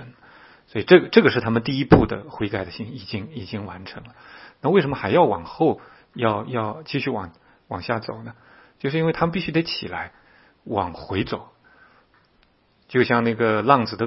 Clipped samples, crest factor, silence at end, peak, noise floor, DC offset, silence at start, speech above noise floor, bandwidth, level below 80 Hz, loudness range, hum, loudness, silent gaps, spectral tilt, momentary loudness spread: under 0.1%; 22 dB; 0 s; 0 dBFS; -61 dBFS; under 0.1%; 0 s; 39 dB; 5.8 kHz; -46 dBFS; 8 LU; none; -22 LUFS; none; -9.5 dB/octave; 17 LU